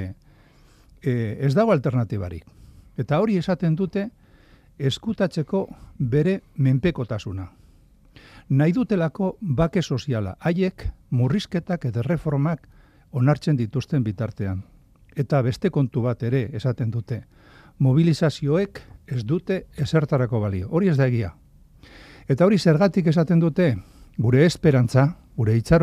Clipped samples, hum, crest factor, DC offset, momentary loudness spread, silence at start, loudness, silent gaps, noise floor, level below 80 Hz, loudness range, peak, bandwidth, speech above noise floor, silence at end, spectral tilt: under 0.1%; none; 18 dB; under 0.1%; 13 LU; 0 s; -23 LUFS; none; -53 dBFS; -46 dBFS; 5 LU; -4 dBFS; 11.5 kHz; 32 dB; 0 s; -8 dB/octave